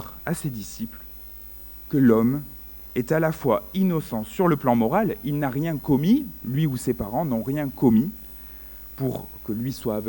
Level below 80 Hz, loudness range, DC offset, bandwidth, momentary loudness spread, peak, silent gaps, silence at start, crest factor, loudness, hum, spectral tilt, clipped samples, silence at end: -48 dBFS; 3 LU; under 0.1%; 17 kHz; 18 LU; -6 dBFS; none; 0 s; 18 dB; -24 LUFS; 60 Hz at -45 dBFS; -7.5 dB/octave; under 0.1%; 0 s